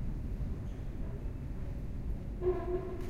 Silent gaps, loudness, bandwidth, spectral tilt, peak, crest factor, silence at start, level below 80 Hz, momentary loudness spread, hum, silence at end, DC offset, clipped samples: none; -40 LUFS; 12 kHz; -9 dB/octave; -20 dBFS; 16 dB; 0 s; -40 dBFS; 7 LU; none; 0 s; under 0.1%; under 0.1%